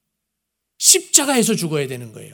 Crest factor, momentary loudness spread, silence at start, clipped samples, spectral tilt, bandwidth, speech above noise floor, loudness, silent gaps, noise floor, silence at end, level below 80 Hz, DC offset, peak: 20 dB; 15 LU; 0.8 s; under 0.1%; -2 dB/octave; over 20 kHz; 59 dB; -15 LUFS; none; -78 dBFS; 0.05 s; -70 dBFS; under 0.1%; 0 dBFS